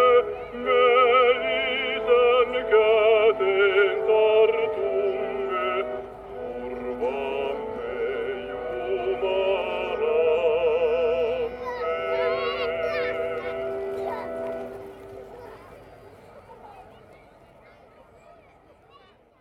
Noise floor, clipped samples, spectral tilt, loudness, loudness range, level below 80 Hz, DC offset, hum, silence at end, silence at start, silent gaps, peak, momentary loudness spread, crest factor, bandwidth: -55 dBFS; under 0.1%; -5.5 dB/octave; -23 LUFS; 13 LU; -54 dBFS; under 0.1%; none; 2.6 s; 0 s; none; -8 dBFS; 15 LU; 16 dB; 5.8 kHz